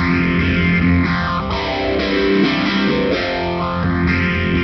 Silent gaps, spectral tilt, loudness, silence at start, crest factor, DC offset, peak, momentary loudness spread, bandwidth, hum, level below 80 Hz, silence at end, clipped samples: none; -7.5 dB/octave; -17 LUFS; 0 s; 12 dB; under 0.1%; -4 dBFS; 5 LU; 6.2 kHz; none; -32 dBFS; 0 s; under 0.1%